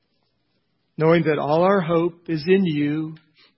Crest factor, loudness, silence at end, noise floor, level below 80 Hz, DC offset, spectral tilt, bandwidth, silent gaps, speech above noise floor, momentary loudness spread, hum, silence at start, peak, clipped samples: 18 dB; -20 LUFS; 0.4 s; -71 dBFS; -60 dBFS; under 0.1%; -11.5 dB/octave; 5.8 kHz; none; 51 dB; 10 LU; none; 1 s; -4 dBFS; under 0.1%